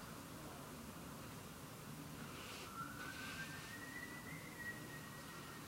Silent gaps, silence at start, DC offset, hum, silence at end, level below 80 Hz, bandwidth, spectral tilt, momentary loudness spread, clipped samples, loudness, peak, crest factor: none; 0 s; under 0.1%; none; 0 s; -68 dBFS; 16 kHz; -3.5 dB/octave; 4 LU; under 0.1%; -50 LUFS; -36 dBFS; 16 dB